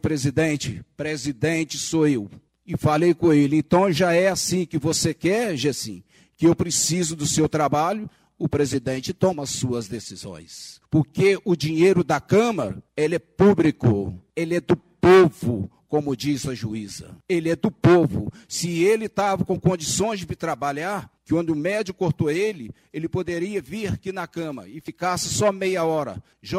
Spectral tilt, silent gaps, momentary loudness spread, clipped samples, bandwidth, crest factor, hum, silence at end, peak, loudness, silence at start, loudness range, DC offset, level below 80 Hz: -5 dB/octave; none; 13 LU; under 0.1%; 15.5 kHz; 20 dB; none; 0 s; -2 dBFS; -22 LUFS; 0.05 s; 6 LU; under 0.1%; -50 dBFS